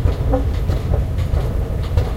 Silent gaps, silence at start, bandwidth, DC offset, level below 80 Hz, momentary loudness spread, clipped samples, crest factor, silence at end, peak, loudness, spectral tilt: none; 0 s; 14 kHz; under 0.1%; -20 dBFS; 2 LU; under 0.1%; 16 dB; 0 s; -2 dBFS; -20 LUFS; -8 dB/octave